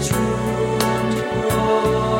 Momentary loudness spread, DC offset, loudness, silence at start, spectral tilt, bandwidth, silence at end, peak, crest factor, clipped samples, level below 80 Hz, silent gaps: 3 LU; under 0.1%; -20 LUFS; 0 s; -5.5 dB/octave; 17 kHz; 0 s; -2 dBFS; 16 dB; under 0.1%; -36 dBFS; none